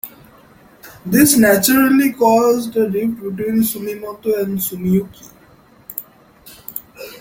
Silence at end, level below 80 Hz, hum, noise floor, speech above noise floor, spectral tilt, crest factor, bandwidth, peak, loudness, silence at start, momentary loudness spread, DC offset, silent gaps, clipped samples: 0.05 s; -52 dBFS; none; -48 dBFS; 33 dB; -4.5 dB/octave; 18 dB; 17 kHz; 0 dBFS; -15 LUFS; 0.05 s; 19 LU; under 0.1%; none; under 0.1%